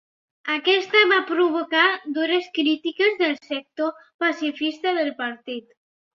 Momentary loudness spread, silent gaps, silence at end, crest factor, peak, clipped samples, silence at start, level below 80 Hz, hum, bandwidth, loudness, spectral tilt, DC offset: 12 LU; 4.14-4.19 s; 0.55 s; 20 dB; -4 dBFS; under 0.1%; 0.45 s; -76 dBFS; none; 7.2 kHz; -21 LUFS; -2.5 dB/octave; under 0.1%